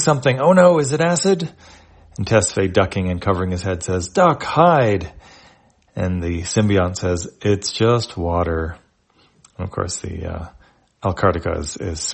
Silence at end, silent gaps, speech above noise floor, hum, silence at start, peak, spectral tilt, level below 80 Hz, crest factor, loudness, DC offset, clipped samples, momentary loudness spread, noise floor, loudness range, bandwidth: 0 s; none; 40 dB; none; 0 s; 0 dBFS; -5 dB/octave; -42 dBFS; 18 dB; -18 LUFS; under 0.1%; under 0.1%; 15 LU; -58 dBFS; 7 LU; 8.8 kHz